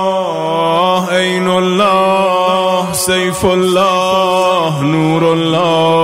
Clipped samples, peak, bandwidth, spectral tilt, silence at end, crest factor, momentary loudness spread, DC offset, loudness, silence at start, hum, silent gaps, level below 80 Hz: under 0.1%; 0 dBFS; 16 kHz; -4.5 dB/octave; 0 s; 12 dB; 3 LU; 0.2%; -12 LUFS; 0 s; none; none; -46 dBFS